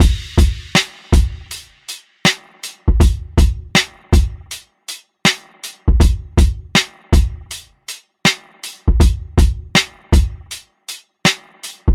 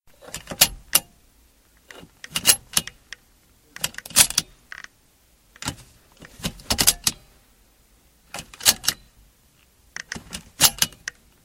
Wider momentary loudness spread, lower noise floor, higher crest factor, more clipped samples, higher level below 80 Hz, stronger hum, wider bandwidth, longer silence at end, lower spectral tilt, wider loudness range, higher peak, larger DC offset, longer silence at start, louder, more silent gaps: second, 16 LU vs 23 LU; second, -36 dBFS vs -59 dBFS; second, 14 dB vs 26 dB; neither; first, -18 dBFS vs -48 dBFS; neither; about the same, 15.5 kHz vs 17 kHz; second, 0 s vs 0.55 s; first, -4 dB/octave vs 0 dB/octave; second, 0 LU vs 4 LU; about the same, -2 dBFS vs 0 dBFS; neither; second, 0 s vs 0.35 s; first, -17 LUFS vs -20 LUFS; neither